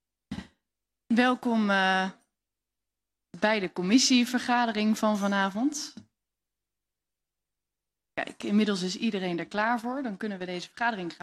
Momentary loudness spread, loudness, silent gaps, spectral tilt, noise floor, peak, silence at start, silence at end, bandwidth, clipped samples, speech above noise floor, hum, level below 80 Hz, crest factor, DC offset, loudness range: 13 LU; -27 LUFS; none; -4 dB/octave; -89 dBFS; -10 dBFS; 0.3 s; 0.1 s; 13 kHz; under 0.1%; 62 dB; 50 Hz at -50 dBFS; -68 dBFS; 20 dB; under 0.1%; 8 LU